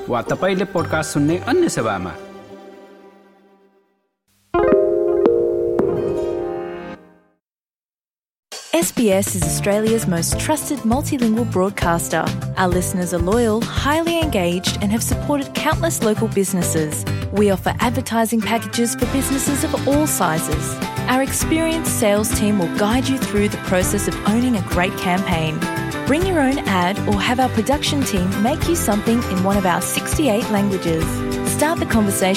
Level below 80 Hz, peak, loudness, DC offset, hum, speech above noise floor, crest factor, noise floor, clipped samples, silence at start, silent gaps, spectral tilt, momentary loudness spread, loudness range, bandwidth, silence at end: -36 dBFS; -2 dBFS; -19 LUFS; under 0.1%; none; over 72 dB; 18 dB; under -90 dBFS; under 0.1%; 0 s; 7.76-7.98 s, 8.39-8.43 s; -4.5 dB/octave; 5 LU; 4 LU; 17 kHz; 0 s